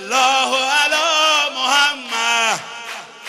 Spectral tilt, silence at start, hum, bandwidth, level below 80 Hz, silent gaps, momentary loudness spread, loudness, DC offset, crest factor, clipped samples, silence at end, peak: 1 dB/octave; 0 s; none; 15.5 kHz; -66 dBFS; none; 11 LU; -15 LUFS; under 0.1%; 14 dB; under 0.1%; 0 s; -4 dBFS